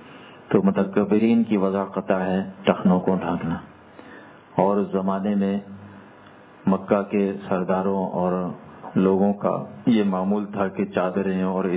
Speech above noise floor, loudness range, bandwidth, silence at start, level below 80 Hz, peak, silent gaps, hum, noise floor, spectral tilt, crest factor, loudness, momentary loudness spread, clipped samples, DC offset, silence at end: 26 dB; 4 LU; 4 kHz; 0 s; -56 dBFS; -2 dBFS; none; none; -47 dBFS; -12 dB/octave; 20 dB; -23 LUFS; 9 LU; under 0.1%; under 0.1%; 0 s